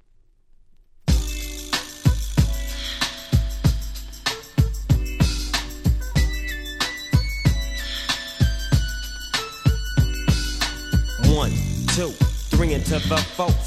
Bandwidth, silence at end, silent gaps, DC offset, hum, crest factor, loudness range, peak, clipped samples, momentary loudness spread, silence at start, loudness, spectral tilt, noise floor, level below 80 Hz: 15 kHz; 0 s; none; under 0.1%; none; 18 dB; 2 LU; -4 dBFS; under 0.1%; 6 LU; 1.05 s; -23 LUFS; -4.5 dB/octave; -55 dBFS; -26 dBFS